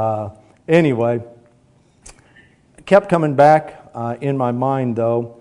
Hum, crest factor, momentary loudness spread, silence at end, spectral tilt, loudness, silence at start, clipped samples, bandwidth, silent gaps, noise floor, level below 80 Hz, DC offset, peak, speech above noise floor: none; 18 dB; 15 LU; 0.05 s; -8 dB/octave; -17 LUFS; 0 s; 0.1%; 11 kHz; none; -54 dBFS; -56 dBFS; under 0.1%; 0 dBFS; 38 dB